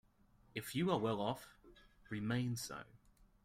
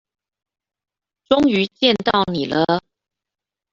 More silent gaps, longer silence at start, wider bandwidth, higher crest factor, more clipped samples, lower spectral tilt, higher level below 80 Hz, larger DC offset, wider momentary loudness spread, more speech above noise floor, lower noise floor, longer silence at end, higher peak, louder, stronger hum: neither; second, 0.55 s vs 1.3 s; first, 16 kHz vs 7.4 kHz; about the same, 20 dB vs 20 dB; neither; about the same, -5.5 dB/octave vs -6 dB/octave; second, -68 dBFS vs -54 dBFS; neither; first, 15 LU vs 5 LU; second, 30 dB vs 70 dB; second, -70 dBFS vs -87 dBFS; second, 0.5 s vs 0.95 s; second, -22 dBFS vs -2 dBFS; second, -41 LUFS vs -18 LUFS; neither